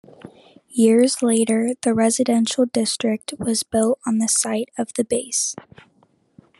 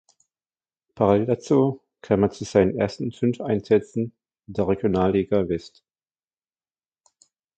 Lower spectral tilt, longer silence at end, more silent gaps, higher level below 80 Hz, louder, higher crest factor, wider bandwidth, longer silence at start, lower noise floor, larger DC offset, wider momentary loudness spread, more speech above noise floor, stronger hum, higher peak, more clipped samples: second, -3.5 dB/octave vs -7.5 dB/octave; second, 1.05 s vs 1.9 s; neither; second, -62 dBFS vs -50 dBFS; first, -20 LUFS vs -23 LUFS; about the same, 16 dB vs 20 dB; first, 12.5 kHz vs 8.8 kHz; second, 0.25 s vs 0.95 s; second, -60 dBFS vs under -90 dBFS; neither; about the same, 8 LU vs 9 LU; second, 40 dB vs over 68 dB; neither; about the same, -4 dBFS vs -4 dBFS; neither